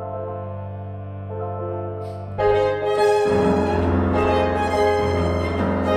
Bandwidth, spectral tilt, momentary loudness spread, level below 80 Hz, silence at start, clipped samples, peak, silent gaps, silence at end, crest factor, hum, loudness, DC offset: 12 kHz; -7 dB/octave; 13 LU; -38 dBFS; 0 s; under 0.1%; -8 dBFS; none; 0 s; 14 dB; none; -21 LUFS; under 0.1%